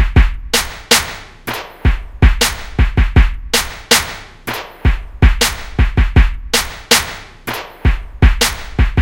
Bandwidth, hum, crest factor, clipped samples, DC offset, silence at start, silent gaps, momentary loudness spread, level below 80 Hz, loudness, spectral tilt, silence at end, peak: 16.5 kHz; none; 14 dB; under 0.1%; under 0.1%; 0 s; none; 12 LU; -16 dBFS; -15 LUFS; -3.5 dB/octave; 0 s; 0 dBFS